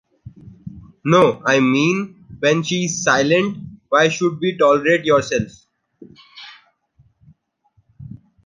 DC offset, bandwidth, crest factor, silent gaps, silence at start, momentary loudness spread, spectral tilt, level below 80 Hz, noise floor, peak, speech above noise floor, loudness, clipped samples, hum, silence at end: under 0.1%; 10.5 kHz; 18 dB; none; 0.25 s; 24 LU; -4.5 dB/octave; -54 dBFS; -62 dBFS; 0 dBFS; 46 dB; -17 LUFS; under 0.1%; none; 0.35 s